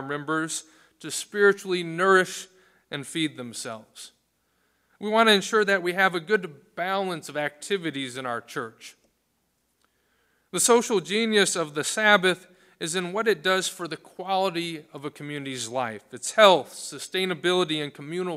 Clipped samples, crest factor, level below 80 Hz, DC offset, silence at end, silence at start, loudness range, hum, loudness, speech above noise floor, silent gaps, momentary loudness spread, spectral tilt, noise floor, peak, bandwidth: under 0.1%; 24 dB; -76 dBFS; under 0.1%; 0 s; 0 s; 7 LU; none; -24 LUFS; 48 dB; none; 17 LU; -3 dB/octave; -73 dBFS; -2 dBFS; 16 kHz